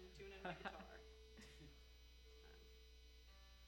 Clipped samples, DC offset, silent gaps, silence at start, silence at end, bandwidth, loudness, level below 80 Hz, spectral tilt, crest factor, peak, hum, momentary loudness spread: under 0.1%; under 0.1%; none; 0 s; 0 s; 16 kHz; -59 LUFS; -66 dBFS; -4.5 dB/octave; 26 dB; -34 dBFS; none; 13 LU